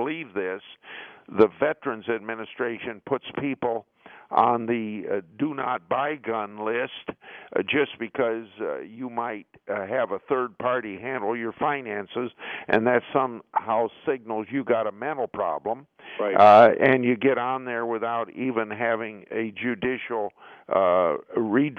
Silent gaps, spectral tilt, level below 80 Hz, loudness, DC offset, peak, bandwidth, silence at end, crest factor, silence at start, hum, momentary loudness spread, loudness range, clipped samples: none; -7.5 dB/octave; -68 dBFS; -25 LUFS; under 0.1%; -4 dBFS; 6.6 kHz; 0 s; 20 dB; 0 s; none; 12 LU; 8 LU; under 0.1%